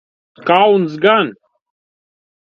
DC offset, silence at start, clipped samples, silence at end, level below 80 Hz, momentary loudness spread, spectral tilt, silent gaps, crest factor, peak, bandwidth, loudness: under 0.1%; 0.45 s; under 0.1%; 1.2 s; -66 dBFS; 11 LU; -7 dB/octave; none; 16 dB; 0 dBFS; 6.6 kHz; -14 LUFS